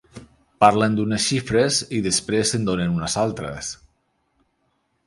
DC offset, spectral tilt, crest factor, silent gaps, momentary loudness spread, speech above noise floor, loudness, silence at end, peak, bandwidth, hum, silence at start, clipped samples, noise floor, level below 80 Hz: under 0.1%; -4 dB/octave; 22 dB; none; 13 LU; 49 dB; -21 LUFS; 1.3 s; 0 dBFS; 11.5 kHz; none; 0.15 s; under 0.1%; -69 dBFS; -48 dBFS